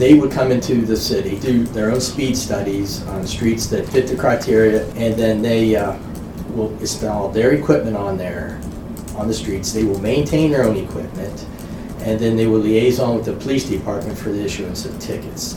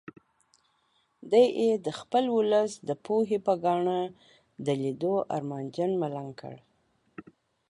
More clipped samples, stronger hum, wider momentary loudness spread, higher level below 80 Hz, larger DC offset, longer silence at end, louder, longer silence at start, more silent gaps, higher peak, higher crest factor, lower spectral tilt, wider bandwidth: neither; neither; second, 12 LU vs 16 LU; first, -36 dBFS vs -76 dBFS; neither; second, 0 s vs 0.5 s; first, -18 LUFS vs -28 LUFS; second, 0 s vs 1.25 s; neither; first, 0 dBFS vs -10 dBFS; about the same, 18 dB vs 18 dB; about the same, -5.5 dB/octave vs -6.5 dB/octave; first, 18.5 kHz vs 11.5 kHz